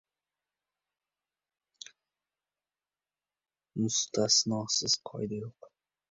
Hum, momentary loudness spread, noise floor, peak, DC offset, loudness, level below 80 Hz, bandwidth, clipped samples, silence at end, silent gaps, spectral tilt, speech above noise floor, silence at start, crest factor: 50 Hz at -70 dBFS; 24 LU; under -90 dBFS; -14 dBFS; under 0.1%; -29 LUFS; -72 dBFS; 8 kHz; under 0.1%; 0.6 s; none; -3 dB/octave; over 59 dB; 3.75 s; 22 dB